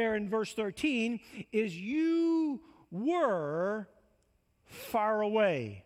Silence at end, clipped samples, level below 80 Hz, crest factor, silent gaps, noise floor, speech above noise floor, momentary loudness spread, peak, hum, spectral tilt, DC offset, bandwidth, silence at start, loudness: 0.05 s; under 0.1%; -70 dBFS; 16 dB; none; -72 dBFS; 41 dB; 12 LU; -16 dBFS; none; -6 dB/octave; under 0.1%; 15.5 kHz; 0 s; -32 LUFS